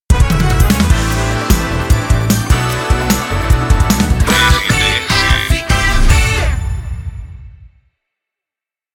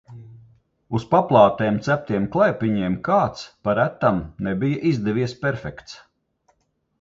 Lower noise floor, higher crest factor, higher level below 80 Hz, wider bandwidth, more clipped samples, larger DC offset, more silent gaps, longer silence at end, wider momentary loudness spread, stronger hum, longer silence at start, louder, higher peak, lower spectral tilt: first, -88 dBFS vs -69 dBFS; second, 12 dB vs 20 dB; first, -16 dBFS vs -50 dBFS; first, 17.5 kHz vs 7.6 kHz; neither; neither; neither; first, 1.25 s vs 1.05 s; second, 9 LU vs 12 LU; neither; about the same, 0.1 s vs 0.1 s; first, -13 LUFS vs -21 LUFS; about the same, 0 dBFS vs -2 dBFS; second, -4.5 dB/octave vs -7.5 dB/octave